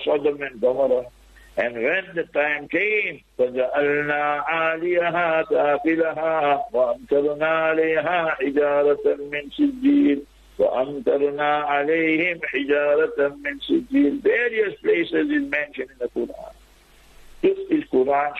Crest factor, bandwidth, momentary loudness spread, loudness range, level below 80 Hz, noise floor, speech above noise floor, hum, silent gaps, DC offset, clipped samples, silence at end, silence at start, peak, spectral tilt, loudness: 12 dB; 6.4 kHz; 7 LU; 2 LU; -56 dBFS; -52 dBFS; 31 dB; none; none; under 0.1%; under 0.1%; 0 s; 0 s; -10 dBFS; -6.5 dB/octave; -22 LUFS